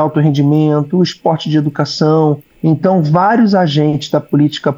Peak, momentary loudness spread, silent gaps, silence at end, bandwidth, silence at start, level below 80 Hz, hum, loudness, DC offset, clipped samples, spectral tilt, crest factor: -2 dBFS; 5 LU; none; 0 s; 7.6 kHz; 0 s; -56 dBFS; none; -13 LUFS; under 0.1%; under 0.1%; -7.5 dB/octave; 10 dB